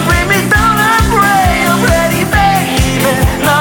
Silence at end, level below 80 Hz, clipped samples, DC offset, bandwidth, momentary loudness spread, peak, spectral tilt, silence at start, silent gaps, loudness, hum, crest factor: 0 s; -20 dBFS; under 0.1%; under 0.1%; 18 kHz; 3 LU; 0 dBFS; -4.5 dB/octave; 0 s; none; -10 LUFS; none; 10 dB